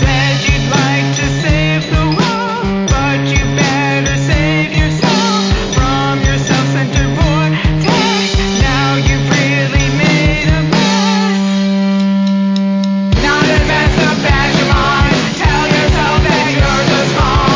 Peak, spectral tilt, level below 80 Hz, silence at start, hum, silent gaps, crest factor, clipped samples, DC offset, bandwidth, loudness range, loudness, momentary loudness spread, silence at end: 0 dBFS; -5 dB/octave; -20 dBFS; 0 s; none; none; 12 dB; under 0.1%; under 0.1%; 7.6 kHz; 2 LU; -12 LUFS; 3 LU; 0 s